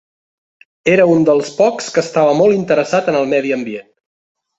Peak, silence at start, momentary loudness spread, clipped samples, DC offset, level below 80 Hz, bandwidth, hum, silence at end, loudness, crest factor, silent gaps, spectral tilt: -2 dBFS; 0.85 s; 9 LU; under 0.1%; under 0.1%; -58 dBFS; 8.2 kHz; none; 0.8 s; -14 LUFS; 14 dB; none; -5.5 dB/octave